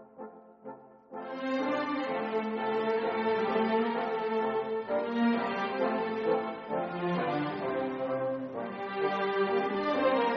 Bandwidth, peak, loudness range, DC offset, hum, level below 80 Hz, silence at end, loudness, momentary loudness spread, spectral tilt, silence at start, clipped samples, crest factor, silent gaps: 6.2 kHz; -16 dBFS; 3 LU; under 0.1%; none; -74 dBFS; 0 s; -31 LUFS; 13 LU; -4 dB/octave; 0 s; under 0.1%; 14 dB; none